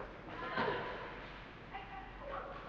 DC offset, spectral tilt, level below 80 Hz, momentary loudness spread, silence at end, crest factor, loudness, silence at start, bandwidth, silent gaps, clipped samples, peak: under 0.1%; -3 dB/octave; -58 dBFS; 12 LU; 0 s; 20 dB; -43 LUFS; 0 s; 7.8 kHz; none; under 0.1%; -24 dBFS